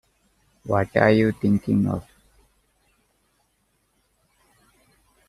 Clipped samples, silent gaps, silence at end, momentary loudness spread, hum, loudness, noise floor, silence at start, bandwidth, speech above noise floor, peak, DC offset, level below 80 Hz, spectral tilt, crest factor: under 0.1%; none; 3.25 s; 11 LU; none; -21 LUFS; -69 dBFS; 0.65 s; 12 kHz; 49 dB; -2 dBFS; under 0.1%; -54 dBFS; -8.5 dB/octave; 24 dB